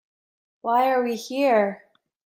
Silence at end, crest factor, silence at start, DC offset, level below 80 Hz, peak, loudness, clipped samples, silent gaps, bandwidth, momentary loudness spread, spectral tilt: 0.5 s; 16 dB; 0.65 s; under 0.1%; -78 dBFS; -8 dBFS; -22 LUFS; under 0.1%; none; 16 kHz; 11 LU; -4.5 dB/octave